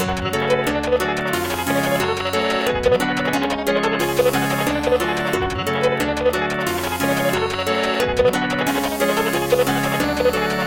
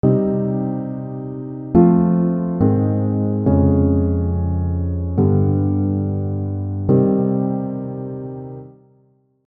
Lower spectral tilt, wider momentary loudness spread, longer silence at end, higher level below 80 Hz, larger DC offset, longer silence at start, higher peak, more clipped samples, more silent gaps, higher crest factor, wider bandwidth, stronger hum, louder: second, -4.5 dB/octave vs -15 dB/octave; second, 3 LU vs 13 LU; second, 0 s vs 0.75 s; about the same, -40 dBFS vs -42 dBFS; neither; about the same, 0 s vs 0.05 s; about the same, -4 dBFS vs -2 dBFS; neither; neither; about the same, 16 dB vs 16 dB; first, 17 kHz vs 2.6 kHz; neither; about the same, -19 LUFS vs -19 LUFS